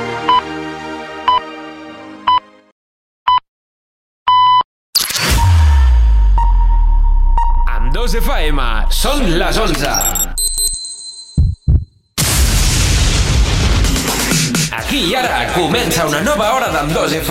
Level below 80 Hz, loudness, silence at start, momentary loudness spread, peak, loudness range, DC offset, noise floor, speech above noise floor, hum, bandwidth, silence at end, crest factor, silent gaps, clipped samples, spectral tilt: -16 dBFS; -14 LUFS; 0 s; 9 LU; -2 dBFS; 5 LU; under 0.1%; under -90 dBFS; over 76 dB; none; 16.5 kHz; 0 s; 12 dB; 2.72-3.26 s, 3.48-4.26 s, 4.64-4.93 s; under 0.1%; -3.5 dB/octave